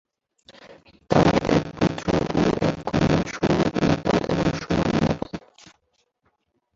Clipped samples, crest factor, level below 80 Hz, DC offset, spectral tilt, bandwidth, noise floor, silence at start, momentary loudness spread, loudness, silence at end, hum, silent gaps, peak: under 0.1%; 20 dB; -42 dBFS; under 0.1%; -6.5 dB/octave; 7.8 kHz; -71 dBFS; 0.5 s; 6 LU; -22 LUFS; 1.4 s; none; none; -2 dBFS